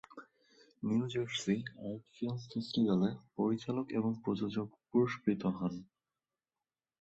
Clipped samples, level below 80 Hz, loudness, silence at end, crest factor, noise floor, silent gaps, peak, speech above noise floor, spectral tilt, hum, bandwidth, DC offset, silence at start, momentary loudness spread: under 0.1%; -72 dBFS; -36 LUFS; 1.15 s; 18 dB; under -90 dBFS; none; -18 dBFS; over 55 dB; -6.5 dB/octave; none; 8.2 kHz; under 0.1%; 0.1 s; 11 LU